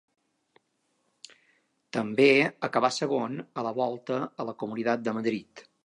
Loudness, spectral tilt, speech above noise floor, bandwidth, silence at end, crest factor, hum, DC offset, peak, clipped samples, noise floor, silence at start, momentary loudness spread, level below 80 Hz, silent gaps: -27 LUFS; -5 dB/octave; 47 dB; 11 kHz; 0.25 s; 22 dB; none; under 0.1%; -8 dBFS; under 0.1%; -75 dBFS; 1.95 s; 14 LU; -80 dBFS; none